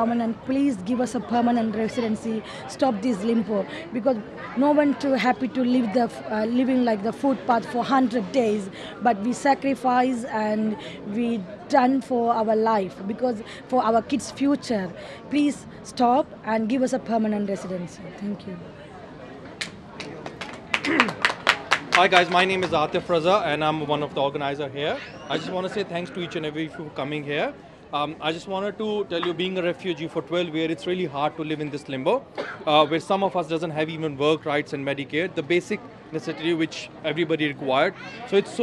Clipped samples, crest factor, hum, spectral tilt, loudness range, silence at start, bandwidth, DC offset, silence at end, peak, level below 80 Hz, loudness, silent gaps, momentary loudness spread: under 0.1%; 24 dB; none; -5 dB/octave; 7 LU; 0 s; 12 kHz; under 0.1%; 0 s; 0 dBFS; -60 dBFS; -24 LUFS; none; 12 LU